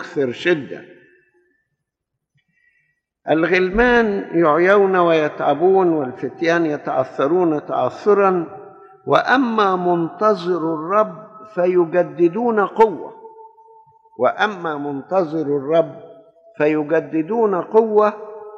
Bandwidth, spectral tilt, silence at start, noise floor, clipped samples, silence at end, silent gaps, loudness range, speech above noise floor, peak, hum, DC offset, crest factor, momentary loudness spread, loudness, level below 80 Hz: 7.4 kHz; -7 dB/octave; 0 s; -79 dBFS; under 0.1%; 0 s; none; 6 LU; 62 dB; -2 dBFS; none; under 0.1%; 16 dB; 10 LU; -18 LUFS; -48 dBFS